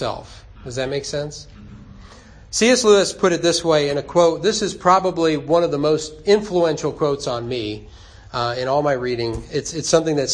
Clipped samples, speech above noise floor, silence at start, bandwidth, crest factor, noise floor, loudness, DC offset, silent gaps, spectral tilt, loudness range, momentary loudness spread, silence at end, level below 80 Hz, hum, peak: under 0.1%; 24 dB; 0 s; 10.5 kHz; 18 dB; -43 dBFS; -19 LUFS; under 0.1%; none; -4 dB/octave; 5 LU; 12 LU; 0 s; -46 dBFS; none; -2 dBFS